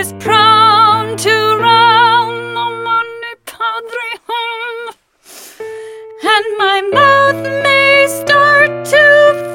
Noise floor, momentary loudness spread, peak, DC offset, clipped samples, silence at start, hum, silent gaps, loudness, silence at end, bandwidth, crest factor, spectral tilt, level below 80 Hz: -39 dBFS; 20 LU; 0 dBFS; under 0.1%; under 0.1%; 0 s; none; none; -10 LUFS; 0 s; 17.5 kHz; 12 dB; -3 dB/octave; -58 dBFS